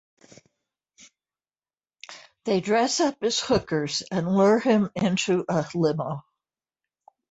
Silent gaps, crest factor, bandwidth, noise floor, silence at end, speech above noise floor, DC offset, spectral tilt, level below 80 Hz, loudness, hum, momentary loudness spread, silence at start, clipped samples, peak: none; 16 dB; 8.2 kHz; under -90 dBFS; 1.1 s; over 67 dB; under 0.1%; -5 dB/octave; -58 dBFS; -24 LUFS; none; 15 LU; 2.1 s; under 0.1%; -10 dBFS